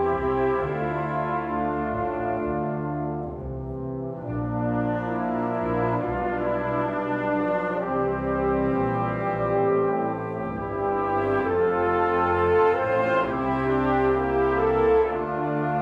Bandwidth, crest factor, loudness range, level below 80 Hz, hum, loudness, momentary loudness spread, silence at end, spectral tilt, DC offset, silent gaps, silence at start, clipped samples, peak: 5.6 kHz; 16 dB; 6 LU; -44 dBFS; none; -25 LUFS; 8 LU; 0 s; -9 dB/octave; under 0.1%; none; 0 s; under 0.1%; -10 dBFS